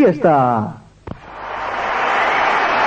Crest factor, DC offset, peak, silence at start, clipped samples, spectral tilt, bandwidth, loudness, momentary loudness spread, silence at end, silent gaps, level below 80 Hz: 16 dB; under 0.1%; -2 dBFS; 0 s; under 0.1%; -6 dB/octave; 8.6 kHz; -16 LUFS; 20 LU; 0 s; none; -48 dBFS